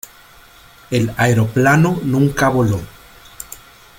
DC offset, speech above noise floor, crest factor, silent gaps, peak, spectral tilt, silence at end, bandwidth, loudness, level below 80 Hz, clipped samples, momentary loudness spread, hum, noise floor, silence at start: under 0.1%; 30 dB; 16 dB; none; -2 dBFS; -6.5 dB/octave; 0.45 s; 17 kHz; -16 LUFS; -44 dBFS; under 0.1%; 22 LU; none; -44 dBFS; 0.9 s